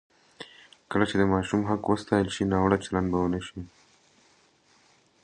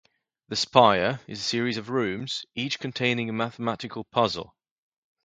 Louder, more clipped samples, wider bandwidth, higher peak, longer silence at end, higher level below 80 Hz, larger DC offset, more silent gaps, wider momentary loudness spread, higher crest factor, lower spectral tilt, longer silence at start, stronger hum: about the same, -26 LUFS vs -26 LUFS; neither; about the same, 10 kHz vs 9.4 kHz; second, -6 dBFS vs 0 dBFS; first, 1.6 s vs 0.8 s; first, -48 dBFS vs -62 dBFS; neither; neither; first, 21 LU vs 12 LU; about the same, 22 dB vs 26 dB; first, -6.5 dB/octave vs -4.5 dB/octave; about the same, 0.4 s vs 0.5 s; neither